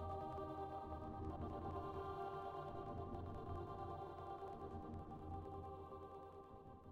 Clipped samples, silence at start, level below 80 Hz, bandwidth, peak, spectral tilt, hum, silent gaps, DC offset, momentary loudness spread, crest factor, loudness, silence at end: under 0.1%; 0 s; -62 dBFS; 8.8 kHz; -36 dBFS; -8.5 dB/octave; none; none; under 0.1%; 7 LU; 14 dB; -51 LUFS; 0 s